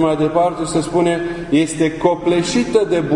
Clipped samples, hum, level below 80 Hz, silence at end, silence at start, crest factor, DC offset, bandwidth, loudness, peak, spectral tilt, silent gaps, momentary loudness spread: under 0.1%; none; -42 dBFS; 0 s; 0 s; 16 dB; under 0.1%; 11 kHz; -17 LUFS; 0 dBFS; -5.5 dB/octave; none; 3 LU